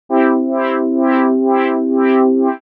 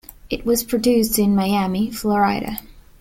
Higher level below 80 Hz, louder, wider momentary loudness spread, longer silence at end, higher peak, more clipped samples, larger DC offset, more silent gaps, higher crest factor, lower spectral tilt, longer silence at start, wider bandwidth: second, -78 dBFS vs -42 dBFS; first, -14 LUFS vs -19 LUFS; second, 4 LU vs 11 LU; about the same, 0.15 s vs 0.2 s; first, 0 dBFS vs -4 dBFS; neither; neither; neither; about the same, 14 dB vs 14 dB; first, -8 dB/octave vs -5 dB/octave; second, 0.1 s vs 0.25 s; second, 4.2 kHz vs 16.5 kHz